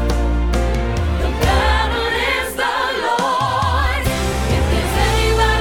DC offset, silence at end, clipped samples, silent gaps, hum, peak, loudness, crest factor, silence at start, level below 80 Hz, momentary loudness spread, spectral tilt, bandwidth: under 0.1%; 0 s; under 0.1%; none; none; -2 dBFS; -18 LUFS; 14 dB; 0 s; -20 dBFS; 4 LU; -4.5 dB/octave; 17.5 kHz